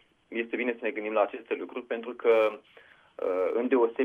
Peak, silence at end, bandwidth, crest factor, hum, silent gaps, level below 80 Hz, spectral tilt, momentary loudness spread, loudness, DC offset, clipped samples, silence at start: -12 dBFS; 0 s; 4 kHz; 18 dB; none; none; -78 dBFS; -6 dB/octave; 10 LU; -29 LUFS; under 0.1%; under 0.1%; 0.3 s